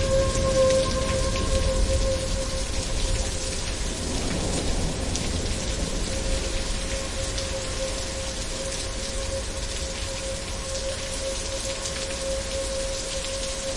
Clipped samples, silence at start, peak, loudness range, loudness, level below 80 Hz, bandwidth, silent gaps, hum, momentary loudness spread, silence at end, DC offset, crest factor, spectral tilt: under 0.1%; 0 s; -10 dBFS; 4 LU; -27 LUFS; -30 dBFS; 11.5 kHz; none; none; 6 LU; 0 s; under 0.1%; 16 dB; -3.5 dB/octave